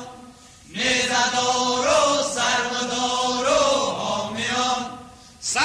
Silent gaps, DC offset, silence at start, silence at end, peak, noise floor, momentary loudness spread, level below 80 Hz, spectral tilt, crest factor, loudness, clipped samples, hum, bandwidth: none; under 0.1%; 0 s; 0 s; -8 dBFS; -46 dBFS; 10 LU; -54 dBFS; -1.5 dB/octave; 14 dB; -21 LUFS; under 0.1%; none; 14 kHz